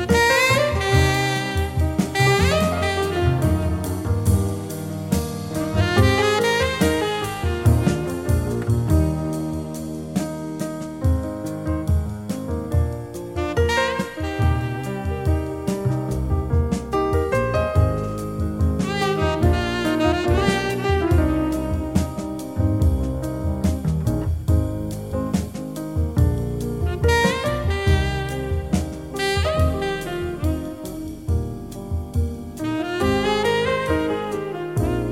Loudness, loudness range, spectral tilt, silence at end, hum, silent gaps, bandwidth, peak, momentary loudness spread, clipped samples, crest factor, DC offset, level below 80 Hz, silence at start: -22 LUFS; 5 LU; -6 dB/octave; 0 s; none; none; 16 kHz; -2 dBFS; 10 LU; under 0.1%; 18 dB; 0.2%; -30 dBFS; 0 s